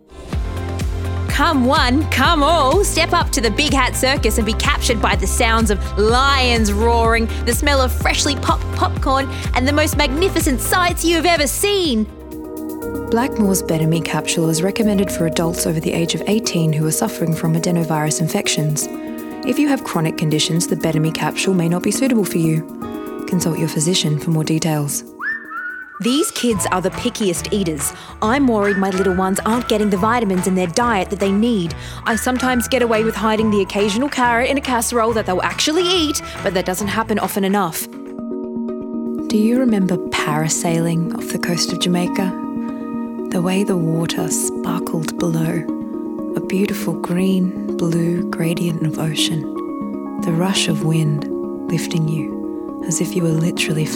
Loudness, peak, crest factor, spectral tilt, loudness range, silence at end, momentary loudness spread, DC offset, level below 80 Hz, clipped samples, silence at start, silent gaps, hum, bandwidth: -18 LUFS; -2 dBFS; 16 dB; -4.5 dB/octave; 4 LU; 0 s; 10 LU; under 0.1%; -30 dBFS; under 0.1%; 0.1 s; none; none; 18 kHz